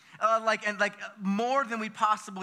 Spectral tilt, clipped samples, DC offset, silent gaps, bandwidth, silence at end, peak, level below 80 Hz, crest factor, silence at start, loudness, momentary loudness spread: -4.5 dB/octave; under 0.1%; under 0.1%; none; 13 kHz; 0 s; -10 dBFS; under -90 dBFS; 18 dB; 0.15 s; -28 LUFS; 6 LU